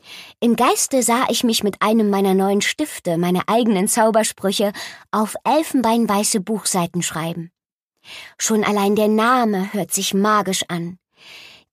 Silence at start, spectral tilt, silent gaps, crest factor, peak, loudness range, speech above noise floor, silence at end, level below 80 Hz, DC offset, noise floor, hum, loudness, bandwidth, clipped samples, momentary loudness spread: 0.05 s; -4 dB/octave; 7.72-7.88 s; 16 dB; -4 dBFS; 3 LU; 60 dB; 0.25 s; -62 dBFS; under 0.1%; -78 dBFS; none; -18 LUFS; 15.5 kHz; under 0.1%; 10 LU